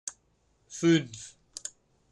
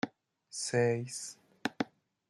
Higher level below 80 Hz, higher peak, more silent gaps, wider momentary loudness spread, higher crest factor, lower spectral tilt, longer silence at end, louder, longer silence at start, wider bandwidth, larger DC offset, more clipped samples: first, -70 dBFS vs -76 dBFS; first, -12 dBFS vs -16 dBFS; neither; first, 19 LU vs 13 LU; about the same, 20 dB vs 20 dB; about the same, -5 dB/octave vs -4.5 dB/octave; about the same, 0.45 s vs 0.45 s; first, -26 LUFS vs -35 LUFS; about the same, 0.05 s vs 0.05 s; second, 11.5 kHz vs 13 kHz; neither; neither